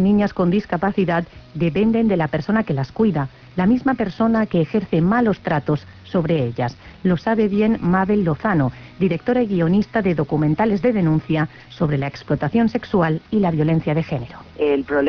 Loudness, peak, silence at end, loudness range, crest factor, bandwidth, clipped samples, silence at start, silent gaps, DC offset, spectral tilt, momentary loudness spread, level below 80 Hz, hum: -20 LUFS; -6 dBFS; 0 s; 1 LU; 14 dB; 5.4 kHz; under 0.1%; 0 s; none; under 0.1%; -9.5 dB/octave; 6 LU; -44 dBFS; none